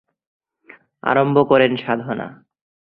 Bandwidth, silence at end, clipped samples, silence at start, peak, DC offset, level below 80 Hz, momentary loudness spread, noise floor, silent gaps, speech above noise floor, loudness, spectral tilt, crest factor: 5 kHz; 0.65 s; under 0.1%; 1.05 s; -2 dBFS; under 0.1%; -62 dBFS; 13 LU; -49 dBFS; none; 32 dB; -18 LUFS; -9.5 dB/octave; 20 dB